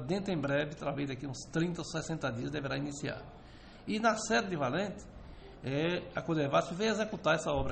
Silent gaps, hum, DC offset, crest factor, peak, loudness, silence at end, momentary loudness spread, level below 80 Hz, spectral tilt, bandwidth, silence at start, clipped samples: none; none; under 0.1%; 18 dB; -16 dBFS; -34 LUFS; 0 s; 17 LU; -54 dBFS; -5 dB/octave; 8.8 kHz; 0 s; under 0.1%